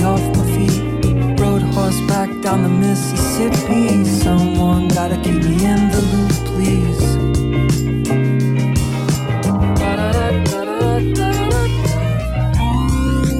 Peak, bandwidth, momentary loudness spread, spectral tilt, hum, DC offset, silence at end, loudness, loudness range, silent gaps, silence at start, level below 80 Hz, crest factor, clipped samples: -6 dBFS; 15.5 kHz; 3 LU; -6.5 dB/octave; none; under 0.1%; 0 s; -16 LUFS; 2 LU; none; 0 s; -24 dBFS; 10 dB; under 0.1%